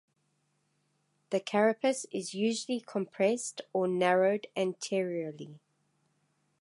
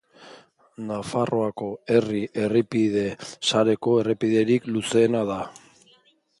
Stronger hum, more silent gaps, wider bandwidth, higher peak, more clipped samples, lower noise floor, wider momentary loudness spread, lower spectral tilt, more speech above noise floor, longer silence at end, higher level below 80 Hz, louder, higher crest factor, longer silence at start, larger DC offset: neither; neither; about the same, 11.5 kHz vs 11.5 kHz; second, -12 dBFS vs -6 dBFS; neither; first, -76 dBFS vs -61 dBFS; about the same, 10 LU vs 11 LU; about the same, -4.5 dB/octave vs -5.5 dB/octave; first, 45 dB vs 38 dB; first, 1.05 s vs 0.9 s; second, -86 dBFS vs -62 dBFS; second, -31 LUFS vs -23 LUFS; about the same, 20 dB vs 18 dB; first, 1.3 s vs 0.2 s; neither